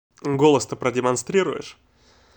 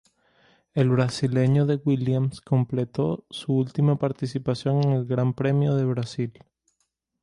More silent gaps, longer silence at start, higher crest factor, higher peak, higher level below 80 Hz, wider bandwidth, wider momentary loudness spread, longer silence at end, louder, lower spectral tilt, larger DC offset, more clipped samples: neither; second, 0.25 s vs 0.75 s; about the same, 18 dB vs 16 dB; first, -4 dBFS vs -8 dBFS; about the same, -62 dBFS vs -60 dBFS; first, over 20 kHz vs 11 kHz; first, 12 LU vs 7 LU; second, 0.65 s vs 0.9 s; first, -21 LUFS vs -24 LUFS; second, -5 dB/octave vs -8 dB/octave; neither; neither